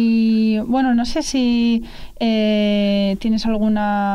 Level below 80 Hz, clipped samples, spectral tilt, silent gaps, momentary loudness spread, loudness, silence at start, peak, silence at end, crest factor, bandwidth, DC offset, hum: -38 dBFS; under 0.1%; -5.5 dB/octave; none; 4 LU; -18 LUFS; 0 s; -8 dBFS; 0 s; 8 dB; 11 kHz; under 0.1%; none